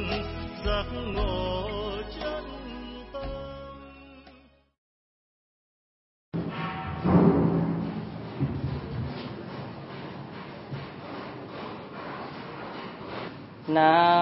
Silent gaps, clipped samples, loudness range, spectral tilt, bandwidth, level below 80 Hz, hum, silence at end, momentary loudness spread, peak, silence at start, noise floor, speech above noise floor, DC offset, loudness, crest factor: 4.78-6.32 s; under 0.1%; 14 LU; -10.5 dB/octave; 5.8 kHz; -44 dBFS; none; 0 s; 18 LU; -6 dBFS; 0 s; -56 dBFS; 34 dB; under 0.1%; -30 LUFS; 22 dB